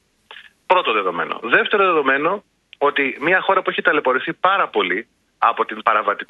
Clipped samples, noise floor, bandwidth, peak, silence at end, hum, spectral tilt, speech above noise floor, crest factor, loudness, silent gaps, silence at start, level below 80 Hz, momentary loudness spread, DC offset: under 0.1%; -44 dBFS; 5.8 kHz; 0 dBFS; 0.05 s; none; -6 dB/octave; 26 dB; 18 dB; -18 LUFS; none; 0.3 s; -70 dBFS; 6 LU; under 0.1%